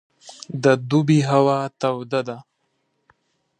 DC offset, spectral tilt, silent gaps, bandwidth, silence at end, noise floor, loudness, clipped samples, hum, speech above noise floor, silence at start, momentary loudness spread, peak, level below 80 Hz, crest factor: under 0.1%; -6.5 dB/octave; none; 10 kHz; 1.2 s; -71 dBFS; -20 LUFS; under 0.1%; none; 51 dB; 0.25 s; 16 LU; -2 dBFS; -68 dBFS; 18 dB